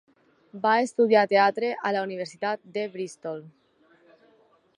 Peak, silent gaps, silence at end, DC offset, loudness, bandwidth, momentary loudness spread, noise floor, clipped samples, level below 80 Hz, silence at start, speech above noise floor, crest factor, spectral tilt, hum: -8 dBFS; none; 1.3 s; under 0.1%; -25 LUFS; 11.5 kHz; 15 LU; -62 dBFS; under 0.1%; -82 dBFS; 0.55 s; 37 dB; 20 dB; -4.5 dB/octave; none